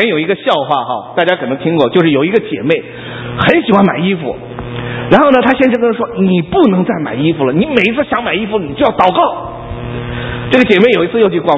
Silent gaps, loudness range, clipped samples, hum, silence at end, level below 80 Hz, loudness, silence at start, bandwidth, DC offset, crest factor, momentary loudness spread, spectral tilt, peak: none; 2 LU; 0.2%; none; 0 s; -38 dBFS; -12 LUFS; 0 s; 8 kHz; under 0.1%; 12 dB; 13 LU; -8 dB/octave; 0 dBFS